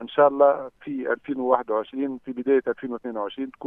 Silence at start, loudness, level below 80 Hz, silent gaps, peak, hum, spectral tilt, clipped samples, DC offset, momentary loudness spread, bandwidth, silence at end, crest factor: 0 s; -24 LUFS; -68 dBFS; none; -2 dBFS; none; -8.5 dB/octave; under 0.1%; under 0.1%; 12 LU; 3.8 kHz; 0 s; 22 dB